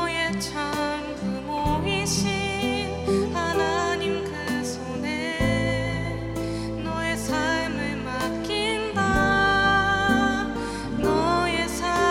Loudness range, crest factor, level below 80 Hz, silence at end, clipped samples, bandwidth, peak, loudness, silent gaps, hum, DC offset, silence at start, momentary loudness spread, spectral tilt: 5 LU; 16 dB; -40 dBFS; 0 s; under 0.1%; 16.5 kHz; -8 dBFS; -24 LUFS; none; none; under 0.1%; 0 s; 9 LU; -4.5 dB/octave